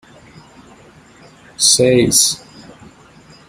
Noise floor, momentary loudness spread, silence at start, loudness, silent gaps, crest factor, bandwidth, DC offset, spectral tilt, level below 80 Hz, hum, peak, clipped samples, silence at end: -44 dBFS; 5 LU; 1.6 s; -11 LUFS; none; 18 dB; 16 kHz; under 0.1%; -2.5 dB/octave; -50 dBFS; none; 0 dBFS; under 0.1%; 1.1 s